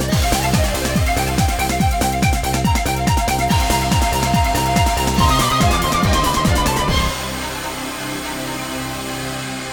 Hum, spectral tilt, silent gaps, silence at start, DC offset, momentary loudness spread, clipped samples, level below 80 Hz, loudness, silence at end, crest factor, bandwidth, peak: none; -4 dB/octave; none; 0 s; under 0.1%; 9 LU; under 0.1%; -24 dBFS; -18 LUFS; 0 s; 16 dB; over 20 kHz; -2 dBFS